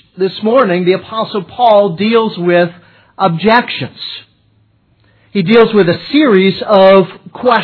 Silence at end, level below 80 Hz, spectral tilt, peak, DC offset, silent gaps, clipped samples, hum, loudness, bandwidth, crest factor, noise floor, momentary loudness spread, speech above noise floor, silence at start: 0 s; -52 dBFS; -9 dB/octave; 0 dBFS; under 0.1%; none; 0.2%; none; -11 LUFS; 5.4 kHz; 12 dB; -53 dBFS; 12 LU; 43 dB; 0.15 s